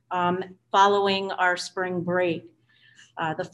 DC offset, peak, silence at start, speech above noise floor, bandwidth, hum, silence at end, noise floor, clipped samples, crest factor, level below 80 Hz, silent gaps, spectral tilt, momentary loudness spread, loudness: under 0.1%; -8 dBFS; 0.1 s; 32 dB; 11.5 kHz; none; 0.05 s; -57 dBFS; under 0.1%; 18 dB; -68 dBFS; none; -4.5 dB/octave; 12 LU; -24 LUFS